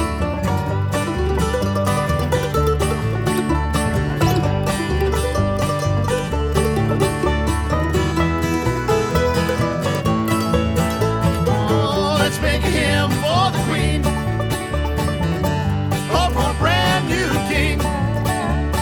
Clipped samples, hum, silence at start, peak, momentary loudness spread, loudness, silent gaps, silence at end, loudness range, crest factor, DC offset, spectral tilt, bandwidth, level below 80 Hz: under 0.1%; none; 0 s; -2 dBFS; 3 LU; -19 LUFS; none; 0 s; 2 LU; 16 dB; under 0.1%; -5.5 dB/octave; 19 kHz; -26 dBFS